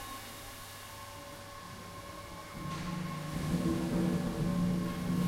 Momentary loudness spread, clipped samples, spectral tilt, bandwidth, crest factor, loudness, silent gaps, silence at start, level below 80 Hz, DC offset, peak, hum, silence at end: 14 LU; under 0.1%; -6 dB/octave; 16 kHz; 16 dB; -37 LUFS; none; 0 s; -50 dBFS; under 0.1%; -20 dBFS; none; 0 s